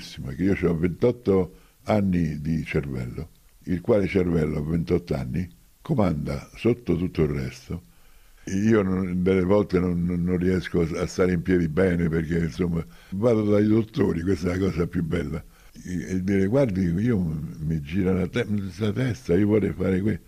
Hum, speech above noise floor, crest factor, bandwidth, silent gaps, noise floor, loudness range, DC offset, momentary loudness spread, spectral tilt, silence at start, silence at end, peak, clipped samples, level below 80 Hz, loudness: none; 28 dB; 16 dB; 14.5 kHz; none; -51 dBFS; 3 LU; under 0.1%; 12 LU; -8 dB/octave; 0 s; 0.05 s; -8 dBFS; under 0.1%; -46 dBFS; -24 LUFS